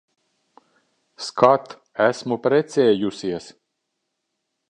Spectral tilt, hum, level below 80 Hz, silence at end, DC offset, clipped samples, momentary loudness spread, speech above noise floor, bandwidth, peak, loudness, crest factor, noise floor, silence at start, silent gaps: -5.5 dB/octave; none; -66 dBFS; 1.2 s; under 0.1%; under 0.1%; 15 LU; 58 dB; 10 kHz; -2 dBFS; -20 LUFS; 20 dB; -77 dBFS; 1.2 s; none